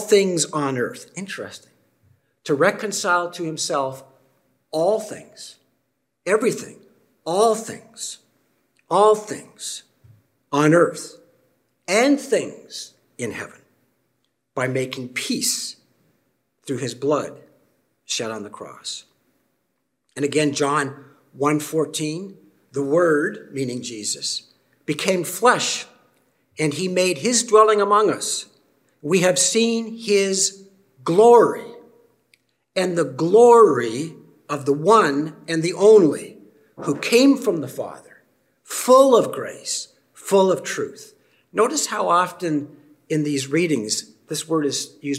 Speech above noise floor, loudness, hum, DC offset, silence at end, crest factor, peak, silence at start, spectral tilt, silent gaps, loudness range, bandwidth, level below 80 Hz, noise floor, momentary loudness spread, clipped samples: 54 dB; -20 LUFS; none; under 0.1%; 0 s; 20 dB; -2 dBFS; 0 s; -4 dB/octave; none; 9 LU; 16 kHz; -74 dBFS; -74 dBFS; 19 LU; under 0.1%